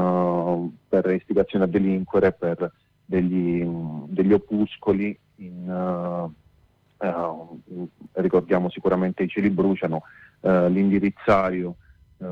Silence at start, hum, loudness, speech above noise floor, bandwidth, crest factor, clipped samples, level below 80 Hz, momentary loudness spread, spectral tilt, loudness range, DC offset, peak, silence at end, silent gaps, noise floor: 0 s; none; -23 LUFS; 38 dB; 5.4 kHz; 16 dB; under 0.1%; -54 dBFS; 13 LU; -9.5 dB/octave; 6 LU; under 0.1%; -8 dBFS; 0 s; none; -60 dBFS